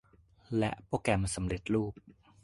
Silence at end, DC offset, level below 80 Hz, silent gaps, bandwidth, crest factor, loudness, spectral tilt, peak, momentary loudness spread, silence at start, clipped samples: 0.35 s; under 0.1%; -50 dBFS; none; 11.5 kHz; 22 dB; -33 LUFS; -5.5 dB/octave; -12 dBFS; 5 LU; 0.5 s; under 0.1%